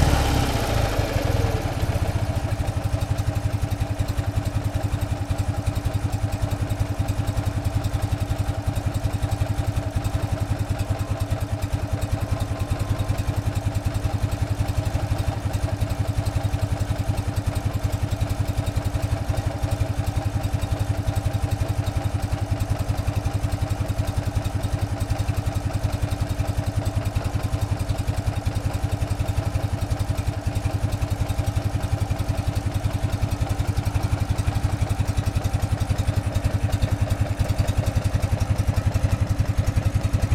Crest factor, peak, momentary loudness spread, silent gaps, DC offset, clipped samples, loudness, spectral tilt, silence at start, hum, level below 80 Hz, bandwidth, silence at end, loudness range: 20 dB; -4 dBFS; 3 LU; none; under 0.1%; under 0.1%; -25 LUFS; -6.5 dB/octave; 0 s; none; -30 dBFS; 15.5 kHz; 0 s; 2 LU